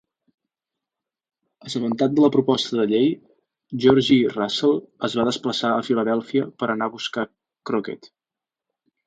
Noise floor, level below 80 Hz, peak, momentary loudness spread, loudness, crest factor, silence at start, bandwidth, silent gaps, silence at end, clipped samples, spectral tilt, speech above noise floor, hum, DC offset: -89 dBFS; -62 dBFS; -4 dBFS; 13 LU; -21 LUFS; 20 dB; 1.65 s; 9.2 kHz; none; 1 s; under 0.1%; -5.5 dB/octave; 68 dB; none; under 0.1%